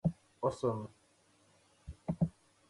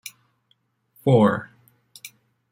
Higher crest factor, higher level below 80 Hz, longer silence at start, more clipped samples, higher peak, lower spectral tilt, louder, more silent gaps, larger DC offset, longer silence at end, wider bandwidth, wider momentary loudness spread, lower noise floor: about the same, 20 dB vs 20 dB; first, -58 dBFS vs -66 dBFS; second, 0.05 s vs 1.05 s; neither; second, -18 dBFS vs -6 dBFS; about the same, -8.5 dB/octave vs -7.5 dB/octave; second, -38 LUFS vs -20 LUFS; neither; neither; about the same, 0.4 s vs 0.45 s; second, 11.5 kHz vs 16.5 kHz; second, 18 LU vs 25 LU; about the same, -69 dBFS vs -68 dBFS